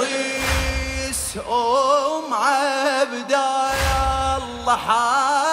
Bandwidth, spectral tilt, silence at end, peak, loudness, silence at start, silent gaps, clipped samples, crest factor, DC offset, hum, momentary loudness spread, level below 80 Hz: 16 kHz; -3 dB/octave; 0 s; -6 dBFS; -20 LUFS; 0 s; none; under 0.1%; 14 dB; under 0.1%; none; 6 LU; -32 dBFS